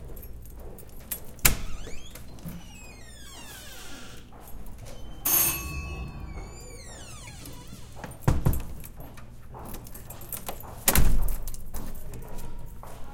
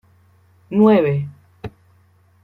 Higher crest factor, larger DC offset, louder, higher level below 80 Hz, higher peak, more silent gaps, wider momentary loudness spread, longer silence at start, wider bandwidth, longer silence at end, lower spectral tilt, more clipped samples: first, 28 dB vs 18 dB; neither; second, -28 LUFS vs -16 LUFS; first, -34 dBFS vs -54 dBFS; about the same, 0 dBFS vs -2 dBFS; neither; about the same, 22 LU vs 24 LU; second, 0 s vs 0.7 s; first, 17 kHz vs 4.4 kHz; second, 0 s vs 0.75 s; second, -3 dB/octave vs -10 dB/octave; neither